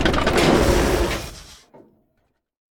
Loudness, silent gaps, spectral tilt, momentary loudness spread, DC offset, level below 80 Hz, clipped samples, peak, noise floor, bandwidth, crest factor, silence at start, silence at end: -19 LUFS; none; -5 dB/octave; 18 LU; under 0.1%; -28 dBFS; under 0.1%; -4 dBFS; -69 dBFS; 18 kHz; 18 dB; 0 s; 1.25 s